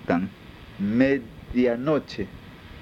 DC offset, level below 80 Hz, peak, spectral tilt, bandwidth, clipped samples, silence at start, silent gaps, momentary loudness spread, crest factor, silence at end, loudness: under 0.1%; -50 dBFS; -6 dBFS; -8 dB/octave; 7.2 kHz; under 0.1%; 0 s; none; 22 LU; 20 dB; 0 s; -25 LUFS